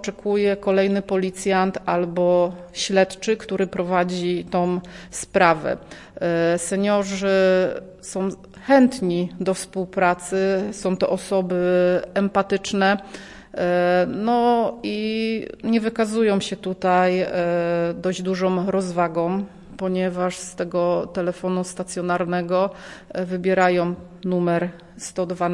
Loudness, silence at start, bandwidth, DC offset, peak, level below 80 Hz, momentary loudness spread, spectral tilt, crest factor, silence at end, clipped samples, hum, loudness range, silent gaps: -22 LUFS; 0 s; 11.5 kHz; under 0.1%; -2 dBFS; -54 dBFS; 10 LU; -5.5 dB/octave; 20 dB; 0 s; under 0.1%; none; 3 LU; none